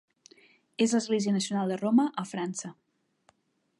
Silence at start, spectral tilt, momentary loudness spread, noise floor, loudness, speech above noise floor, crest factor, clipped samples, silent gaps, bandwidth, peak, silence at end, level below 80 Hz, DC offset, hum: 0.8 s; -5 dB/octave; 13 LU; -68 dBFS; -28 LUFS; 41 dB; 16 dB; under 0.1%; none; 11.5 kHz; -14 dBFS; 1.1 s; -80 dBFS; under 0.1%; none